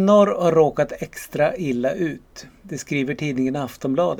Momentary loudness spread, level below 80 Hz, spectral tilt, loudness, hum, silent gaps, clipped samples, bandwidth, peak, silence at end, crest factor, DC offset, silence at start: 17 LU; -52 dBFS; -6.5 dB/octave; -21 LUFS; none; none; under 0.1%; 18.5 kHz; -4 dBFS; 0 s; 16 dB; under 0.1%; 0 s